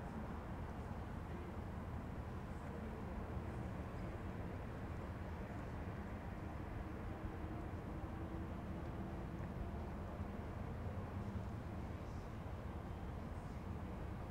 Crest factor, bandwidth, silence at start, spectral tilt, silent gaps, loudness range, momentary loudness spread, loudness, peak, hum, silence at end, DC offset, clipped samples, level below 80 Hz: 14 dB; 16 kHz; 0 s; -8 dB/octave; none; 1 LU; 2 LU; -48 LUFS; -34 dBFS; none; 0 s; under 0.1%; under 0.1%; -54 dBFS